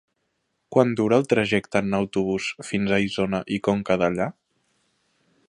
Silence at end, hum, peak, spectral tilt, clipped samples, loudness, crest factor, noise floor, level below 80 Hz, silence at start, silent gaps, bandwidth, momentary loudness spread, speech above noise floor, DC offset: 1.2 s; none; -2 dBFS; -6 dB/octave; under 0.1%; -23 LUFS; 22 dB; -74 dBFS; -56 dBFS; 0.7 s; none; 11 kHz; 7 LU; 52 dB; under 0.1%